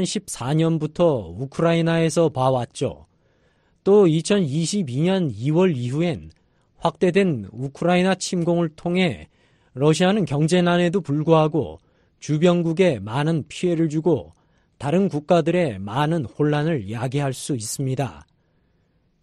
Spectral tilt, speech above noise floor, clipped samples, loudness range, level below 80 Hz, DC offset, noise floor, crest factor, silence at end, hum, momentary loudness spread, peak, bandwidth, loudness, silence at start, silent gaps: -6 dB/octave; 44 dB; under 0.1%; 2 LU; -54 dBFS; under 0.1%; -64 dBFS; 18 dB; 1 s; none; 9 LU; -4 dBFS; 13 kHz; -21 LUFS; 0 s; none